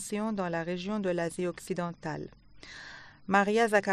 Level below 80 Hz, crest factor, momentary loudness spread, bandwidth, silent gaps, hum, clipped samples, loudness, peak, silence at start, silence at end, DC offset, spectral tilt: -64 dBFS; 20 dB; 21 LU; 13.5 kHz; none; none; under 0.1%; -31 LUFS; -12 dBFS; 0 s; 0 s; under 0.1%; -5 dB/octave